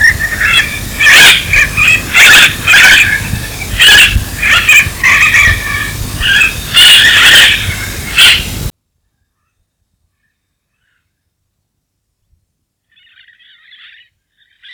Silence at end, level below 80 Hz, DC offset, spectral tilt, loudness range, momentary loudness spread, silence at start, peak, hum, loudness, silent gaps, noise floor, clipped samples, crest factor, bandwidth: 6.05 s; -26 dBFS; under 0.1%; -0.5 dB/octave; 8 LU; 14 LU; 0 s; 0 dBFS; none; -4 LUFS; none; -67 dBFS; 3%; 10 dB; over 20 kHz